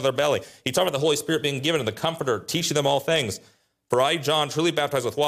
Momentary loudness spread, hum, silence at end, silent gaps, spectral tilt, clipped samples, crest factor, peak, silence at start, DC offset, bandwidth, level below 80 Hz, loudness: 5 LU; none; 0 s; none; -3.5 dB/octave; under 0.1%; 14 dB; -10 dBFS; 0 s; under 0.1%; 15.5 kHz; -62 dBFS; -23 LUFS